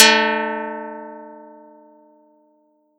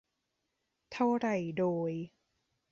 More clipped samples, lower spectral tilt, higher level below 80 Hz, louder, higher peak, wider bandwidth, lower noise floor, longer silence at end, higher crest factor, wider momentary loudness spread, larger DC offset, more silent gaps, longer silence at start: neither; second, -0.5 dB/octave vs -7.5 dB/octave; second, under -90 dBFS vs -74 dBFS; first, -18 LUFS vs -33 LUFS; first, 0 dBFS vs -18 dBFS; first, 18.5 kHz vs 7.4 kHz; second, -61 dBFS vs -83 dBFS; first, 1.55 s vs 0.65 s; about the same, 22 dB vs 18 dB; first, 25 LU vs 15 LU; neither; neither; second, 0 s vs 0.9 s